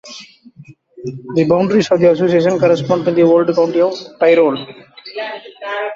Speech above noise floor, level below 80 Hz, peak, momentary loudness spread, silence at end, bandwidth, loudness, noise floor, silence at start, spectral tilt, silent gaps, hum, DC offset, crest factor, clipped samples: 28 dB; -56 dBFS; -2 dBFS; 18 LU; 0 s; 7.4 kHz; -14 LUFS; -42 dBFS; 0.05 s; -6.5 dB/octave; none; none; under 0.1%; 14 dB; under 0.1%